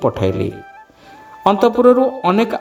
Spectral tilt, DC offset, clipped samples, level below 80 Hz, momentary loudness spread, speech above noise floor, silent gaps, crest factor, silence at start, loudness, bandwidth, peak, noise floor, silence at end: -7.5 dB/octave; under 0.1%; under 0.1%; -48 dBFS; 12 LU; 27 dB; none; 16 dB; 0 s; -15 LUFS; 13 kHz; 0 dBFS; -42 dBFS; 0 s